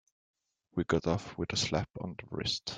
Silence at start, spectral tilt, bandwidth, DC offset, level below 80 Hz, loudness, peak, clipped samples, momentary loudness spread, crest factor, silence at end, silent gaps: 0.75 s; -4.5 dB/octave; 10 kHz; under 0.1%; -58 dBFS; -34 LUFS; -14 dBFS; under 0.1%; 9 LU; 20 dB; 0 s; none